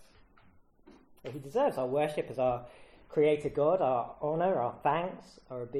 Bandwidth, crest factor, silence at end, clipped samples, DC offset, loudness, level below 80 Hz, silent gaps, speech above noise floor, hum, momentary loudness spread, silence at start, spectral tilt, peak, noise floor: 13.5 kHz; 16 dB; 0 s; under 0.1%; under 0.1%; -31 LUFS; -62 dBFS; none; 30 dB; none; 16 LU; 0.85 s; -7 dB/octave; -16 dBFS; -61 dBFS